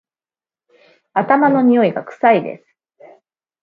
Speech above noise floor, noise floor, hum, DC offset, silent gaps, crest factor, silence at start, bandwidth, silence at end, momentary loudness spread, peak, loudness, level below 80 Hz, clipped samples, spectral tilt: over 76 dB; under -90 dBFS; none; under 0.1%; none; 18 dB; 1.15 s; 4.7 kHz; 1.05 s; 13 LU; 0 dBFS; -15 LUFS; -68 dBFS; under 0.1%; -9 dB/octave